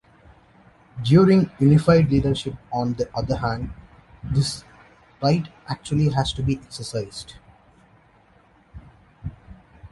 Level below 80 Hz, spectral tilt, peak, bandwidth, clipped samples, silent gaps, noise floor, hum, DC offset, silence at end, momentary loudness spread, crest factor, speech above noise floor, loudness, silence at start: -42 dBFS; -7 dB/octave; -4 dBFS; 11.5 kHz; under 0.1%; none; -56 dBFS; none; under 0.1%; 0.05 s; 21 LU; 20 dB; 36 dB; -21 LUFS; 0.95 s